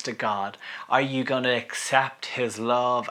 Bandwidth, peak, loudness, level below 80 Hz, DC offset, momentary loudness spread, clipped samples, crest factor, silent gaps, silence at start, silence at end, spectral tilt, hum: 16 kHz; -4 dBFS; -25 LUFS; -84 dBFS; under 0.1%; 6 LU; under 0.1%; 22 dB; none; 0 s; 0 s; -3.5 dB/octave; none